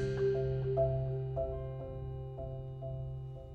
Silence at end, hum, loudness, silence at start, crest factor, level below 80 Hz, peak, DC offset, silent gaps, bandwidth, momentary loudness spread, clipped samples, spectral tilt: 0 s; none; -37 LUFS; 0 s; 16 dB; -48 dBFS; -20 dBFS; under 0.1%; none; 6.6 kHz; 11 LU; under 0.1%; -9.5 dB/octave